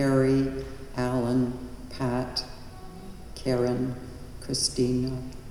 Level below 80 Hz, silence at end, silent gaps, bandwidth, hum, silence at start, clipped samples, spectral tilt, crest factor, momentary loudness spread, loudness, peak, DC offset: -44 dBFS; 0 s; none; 14.5 kHz; none; 0 s; under 0.1%; -5.5 dB/octave; 18 dB; 18 LU; -28 LUFS; -10 dBFS; under 0.1%